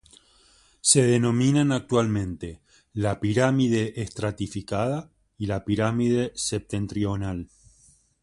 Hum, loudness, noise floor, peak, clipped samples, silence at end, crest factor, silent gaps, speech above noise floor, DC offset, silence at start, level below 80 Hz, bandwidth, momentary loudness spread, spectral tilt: none; -24 LUFS; -59 dBFS; -4 dBFS; under 0.1%; 0.8 s; 22 dB; none; 35 dB; under 0.1%; 0.85 s; -48 dBFS; 11.5 kHz; 13 LU; -5 dB/octave